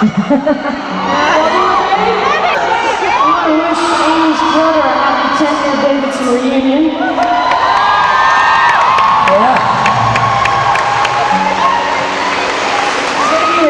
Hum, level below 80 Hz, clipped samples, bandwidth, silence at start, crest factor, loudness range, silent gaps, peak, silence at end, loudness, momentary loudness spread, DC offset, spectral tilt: none; -42 dBFS; under 0.1%; 11 kHz; 0 s; 10 dB; 2 LU; none; -2 dBFS; 0 s; -11 LUFS; 5 LU; under 0.1%; -4 dB/octave